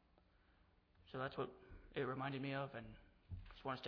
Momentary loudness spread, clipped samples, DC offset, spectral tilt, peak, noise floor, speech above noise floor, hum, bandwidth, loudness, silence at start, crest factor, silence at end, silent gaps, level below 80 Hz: 15 LU; under 0.1%; under 0.1%; -4.5 dB/octave; -32 dBFS; -74 dBFS; 28 dB; none; 5.4 kHz; -48 LUFS; 1 s; 18 dB; 0 s; none; -66 dBFS